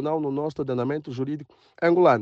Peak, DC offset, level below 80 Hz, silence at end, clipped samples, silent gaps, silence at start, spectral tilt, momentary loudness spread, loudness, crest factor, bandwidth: -6 dBFS; under 0.1%; -66 dBFS; 0 s; under 0.1%; none; 0 s; -8.5 dB/octave; 12 LU; -25 LUFS; 18 dB; 7.2 kHz